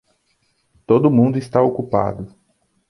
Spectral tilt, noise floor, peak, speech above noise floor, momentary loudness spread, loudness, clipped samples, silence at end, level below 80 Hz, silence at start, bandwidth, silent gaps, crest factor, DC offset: -9.5 dB/octave; -65 dBFS; -2 dBFS; 49 dB; 14 LU; -17 LUFS; under 0.1%; 0.65 s; -52 dBFS; 0.9 s; 11.5 kHz; none; 18 dB; under 0.1%